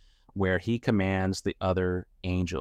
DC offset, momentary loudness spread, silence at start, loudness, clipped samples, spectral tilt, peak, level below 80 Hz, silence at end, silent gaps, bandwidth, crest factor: under 0.1%; 6 LU; 0.35 s; -29 LUFS; under 0.1%; -6.5 dB/octave; -10 dBFS; -50 dBFS; 0 s; none; 12 kHz; 18 dB